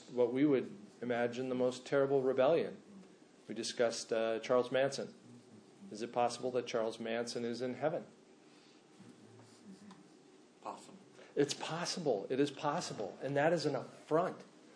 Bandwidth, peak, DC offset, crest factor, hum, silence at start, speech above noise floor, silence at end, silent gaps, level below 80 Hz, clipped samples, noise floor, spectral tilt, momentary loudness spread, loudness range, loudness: 10.5 kHz; -18 dBFS; under 0.1%; 18 dB; none; 0 s; 27 dB; 0.05 s; none; under -90 dBFS; under 0.1%; -62 dBFS; -5 dB/octave; 18 LU; 10 LU; -36 LUFS